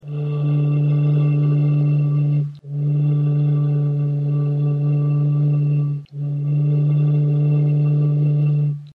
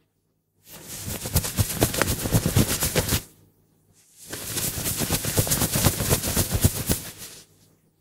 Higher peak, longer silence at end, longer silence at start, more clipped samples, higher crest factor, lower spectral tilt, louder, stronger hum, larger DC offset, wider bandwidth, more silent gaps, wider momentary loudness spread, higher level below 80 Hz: second, -10 dBFS vs 0 dBFS; second, 0.05 s vs 0.6 s; second, 0.05 s vs 0.7 s; neither; second, 8 dB vs 26 dB; first, -12 dB/octave vs -3.5 dB/octave; first, -19 LUFS vs -24 LUFS; neither; neither; second, 3.6 kHz vs 16 kHz; neither; second, 5 LU vs 14 LU; second, -66 dBFS vs -38 dBFS